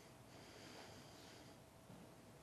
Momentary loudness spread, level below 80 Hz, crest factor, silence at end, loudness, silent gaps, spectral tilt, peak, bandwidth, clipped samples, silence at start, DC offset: 5 LU; -78 dBFS; 18 dB; 0 s; -60 LUFS; none; -4 dB/octave; -44 dBFS; 13.5 kHz; under 0.1%; 0 s; under 0.1%